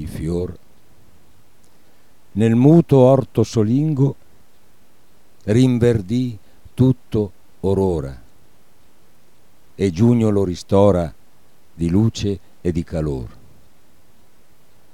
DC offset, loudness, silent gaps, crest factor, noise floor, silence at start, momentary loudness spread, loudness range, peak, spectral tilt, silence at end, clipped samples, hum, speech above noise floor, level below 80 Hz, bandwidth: 1%; -18 LUFS; none; 18 dB; -56 dBFS; 0 s; 17 LU; 7 LU; -2 dBFS; -8.5 dB/octave; 1.65 s; under 0.1%; none; 40 dB; -42 dBFS; 13 kHz